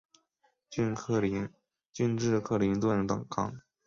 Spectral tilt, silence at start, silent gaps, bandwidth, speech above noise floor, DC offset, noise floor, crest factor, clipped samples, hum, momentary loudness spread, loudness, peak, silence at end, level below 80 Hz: -6.5 dB/octave; 0.7 s; 1.86-1.90 s; 7.6 kHz; 44 dB; under 0.1%; -74 dBFS; 18 dB; under 0.1%; none; 10 LU; -31 LUFS; -14 dBFS; 0.25 s; -58 dBFS